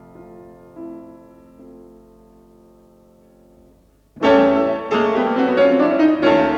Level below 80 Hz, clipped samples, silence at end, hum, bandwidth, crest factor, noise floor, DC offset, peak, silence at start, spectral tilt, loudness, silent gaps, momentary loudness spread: -54 dBFS; under 0.1%; 0 s; 50 Hz at -60 dBFS; 7.2 kHz; 16 dB; -53 dBFS; under 0.1%; -2 dBFS; 0.2 s; -6.5 dB/octave; -16 LUFS; none; 21 LU